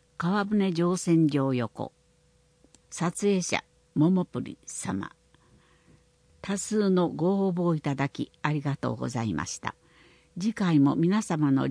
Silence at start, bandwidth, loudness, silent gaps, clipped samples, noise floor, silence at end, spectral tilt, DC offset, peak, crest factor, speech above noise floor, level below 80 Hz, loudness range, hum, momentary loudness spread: 0.2 s; 10.5 kHz; -27 LUFS; none; under 0.1%; -64 dBFS; 0 s; -6 dB/octave; under 0.1%; -8 dBFS; 20 dB; 38 dB; -62 dBFS; 3 LU; none; 12 LU